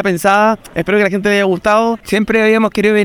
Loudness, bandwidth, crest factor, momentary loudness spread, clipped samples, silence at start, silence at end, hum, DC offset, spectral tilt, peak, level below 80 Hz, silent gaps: -13 LUFS; 19 kHz; 12 dB; 4 LU; under 0.1%; 0 s; 0 s; none; under 0.1%; -5.5 dB/octave; 0 dBFS; -44 dBFS; none